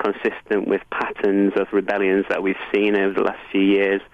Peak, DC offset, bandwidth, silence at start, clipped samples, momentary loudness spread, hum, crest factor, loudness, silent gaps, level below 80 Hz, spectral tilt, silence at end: -6 dBFS; under 0.1%; 5.8 kHz; 0 s; under 0.1%; 5 LU; none; 14 dB; -20 LUFS; none; -56 dBFS; -7.5 dB/octave; 0.1 s